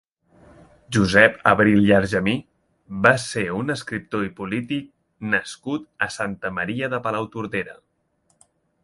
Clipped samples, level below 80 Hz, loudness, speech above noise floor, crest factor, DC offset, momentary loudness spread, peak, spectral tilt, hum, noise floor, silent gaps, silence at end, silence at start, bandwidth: under 0.1%; -50 dBFS; -21 LUFS; 46 dB; 22 dB; under 0.1%; 14 LU; 0 dBFS; -5.5 dB/octave; none; -67 dBFS; none; 1.1 s; 0.9 s; 11.5 kHz